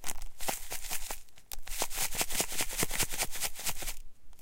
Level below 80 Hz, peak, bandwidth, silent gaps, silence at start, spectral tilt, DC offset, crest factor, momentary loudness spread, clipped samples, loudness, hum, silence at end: -42 dBFS; -12 dBFS; 17 kHz; none; 0 s; -1 dB/octave; under 0.1%; 20 dB; 12 LU; under 0.1%; -34 LUFS; none; 0 s